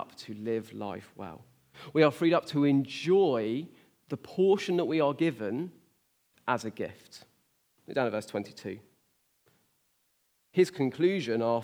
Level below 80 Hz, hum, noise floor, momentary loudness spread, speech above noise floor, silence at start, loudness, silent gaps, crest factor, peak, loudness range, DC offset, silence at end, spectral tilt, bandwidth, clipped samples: -80 dBFS; none; -73 dBFS; 17 LU; 44 dB; 0 s; -29 LUFS; none; 22 dB; -8 dBFS; 10 LU; under 0.1%; 0 s; -6.5 dB/octave; 14.5 kHz; under 0.1%